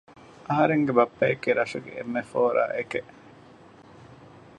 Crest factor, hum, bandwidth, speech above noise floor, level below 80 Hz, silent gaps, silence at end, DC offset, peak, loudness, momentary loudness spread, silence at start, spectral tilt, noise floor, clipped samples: 22 dB; none; 10 kHz; 26 dB; -66 dBFS; none; 0.45 s; under 0.1%; -4 dBFS; -25 LUFS; 11 LU; 0.45 s; -7 dB/octave; -51 dBFS; under 0.1%